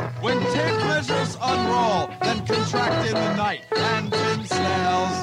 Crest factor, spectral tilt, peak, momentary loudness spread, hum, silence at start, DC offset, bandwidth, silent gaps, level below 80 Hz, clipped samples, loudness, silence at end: 12 dB; -5 dB/octave; -10 dBFS; 3 LU; none; 0 s; under 0.1%; 15 kHz; none; -54 dBFS; under 0.1%; -22 LUFS; 0 s